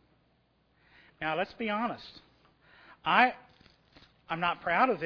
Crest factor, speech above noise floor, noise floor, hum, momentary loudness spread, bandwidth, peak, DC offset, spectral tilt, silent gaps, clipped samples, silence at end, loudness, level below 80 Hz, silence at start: 24 dB; 41 dB; -70 dBFS; none; 17 LU; 5.4 kHz; -8 dBFS; under 0.1%; -6.5 dB/octave; none; under 0.1%; 0 s; -30 LUFS; -68 dBFS; 1.2 s